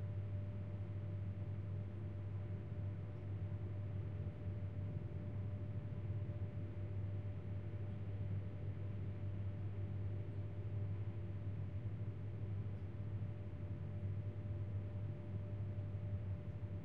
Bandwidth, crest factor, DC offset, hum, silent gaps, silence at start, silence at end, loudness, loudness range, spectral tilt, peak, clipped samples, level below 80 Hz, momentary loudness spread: 3.8 kHz; 12 dB; 0.2%; none; none; 0 s; 0 s; -46 LUFS; 1 LU; -9.5 dB/octave; -32 dBFS; under 0.1%; -60 dBFS; 2 LU